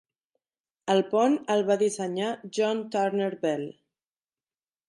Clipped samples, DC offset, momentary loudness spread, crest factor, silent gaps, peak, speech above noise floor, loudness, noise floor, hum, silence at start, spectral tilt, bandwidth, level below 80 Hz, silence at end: under 0.1%; under 0.1%; 7 LU; 16 dB; none; -12 dBFS; over 64 dB; -26 LUFS; under -90 dBFS; none; 0.85 s; -5 dB/octave; 11.5 kHz; -80 dBFS; 1.2 s